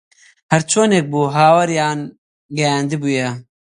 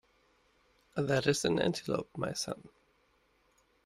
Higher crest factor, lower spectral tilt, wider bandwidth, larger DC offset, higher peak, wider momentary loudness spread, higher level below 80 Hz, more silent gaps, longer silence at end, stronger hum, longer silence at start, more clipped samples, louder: second, 16 dB vs 22 dB; about the same, -4.5 dB/octave vs -4.5 dB/octave; second, 11.5 kHz vs 15.5 kHz; neither; first, 0 dBFS vs -14 dBFS; first, 14 LU vs 11 LU; first, -60 dBFS vs -66 dBFS; first, 2.18-2.49 s vs none; second, 0.35 s vs 1.2 s; neither; second, 0.5 s vs 0.95 s; neither; first, -16 LUFS vs -33 LUFS